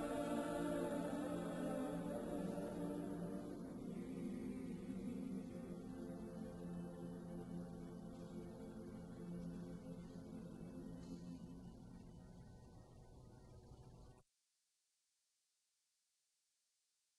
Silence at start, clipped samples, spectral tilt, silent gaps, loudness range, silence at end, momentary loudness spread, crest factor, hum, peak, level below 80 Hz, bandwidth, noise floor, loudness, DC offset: 0 s; under 0.1%; -7 dB/octave; none; 19 LU; 2.95 s; 19 LU; 20 dB; none; -30 dBFS; -66 dBFS; 13 kHz; -87 dBFS; -49 LUFS; under 0.1%